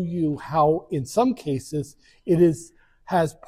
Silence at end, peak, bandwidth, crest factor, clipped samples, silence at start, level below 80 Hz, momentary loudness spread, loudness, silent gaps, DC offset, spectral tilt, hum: 0.15 s; -8 dBFS; 15 kHz; 16 dB; under 0.1%; 0 s; -54 dBFS; 13 LU; -23 LUFS; none; under 0.1%; -7 dB/octave; none